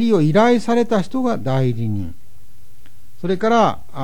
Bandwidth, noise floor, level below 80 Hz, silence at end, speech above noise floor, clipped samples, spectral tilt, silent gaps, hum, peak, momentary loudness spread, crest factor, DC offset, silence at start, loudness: 17.5 kHz; -50 dBFS; -50 dBFS; 0 s; 33 dB; under 0.1%; -7 dB/octave; none; none; -4 dBFS; 11 LU; 16 dB; 6%; 0 s; -18 LUFS